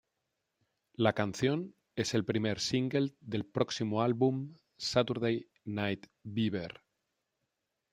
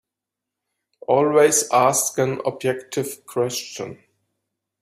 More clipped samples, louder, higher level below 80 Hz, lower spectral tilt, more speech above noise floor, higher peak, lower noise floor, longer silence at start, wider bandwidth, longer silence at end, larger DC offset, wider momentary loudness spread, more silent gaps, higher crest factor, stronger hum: neither; second, -33 LUFS vs -20 LUFS; about the same, -70 dBFS vs -66 dBFS; first, -5.5 dB/octave vs -3.5 dB/octave; second, 52 dB vs 65 dB; second, -10 dBFS vs -4 dBFS; about the same, -85 dBFS vs -85 dBFS; about the same, 1 s vs 1.1 s; about the same, 15.5 kHz vs 16 kHz; first, 1.2 s vs 0.85 s; neither; second, 10 LU vs 16 LU; neither; first, 24 dB vs 18 dB; neither